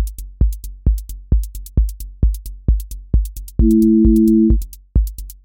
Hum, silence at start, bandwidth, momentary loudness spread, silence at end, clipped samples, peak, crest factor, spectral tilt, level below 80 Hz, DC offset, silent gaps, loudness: none; 0 s; 17 kHz; 12 LU; 0.1 s; under 0.1%; -2 dBFS; 14 dB; -9.5 dB/octave; -18 dBFS; under 0.1%; none; -18 LUFS